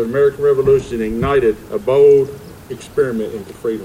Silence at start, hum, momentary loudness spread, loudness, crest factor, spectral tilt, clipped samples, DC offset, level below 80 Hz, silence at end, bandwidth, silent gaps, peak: 0 s; none; 15 LU; -15 LUFS; 12 dB; -7 dB/octave; under 0.1%; under 0.1%; -40 dBFS; 0 s; 15 kHz; none; -2 dBFS